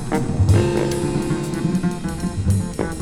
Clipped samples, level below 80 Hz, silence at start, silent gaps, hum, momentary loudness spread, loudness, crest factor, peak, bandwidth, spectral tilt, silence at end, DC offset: under 0.1%; -32 dBFS; 0 s; none; none; 8 LU; -21 LUFS; 16 dB; -4 dBFS; 13.5 kHz; -6.5 dB/octave; 0 s; under 0.1%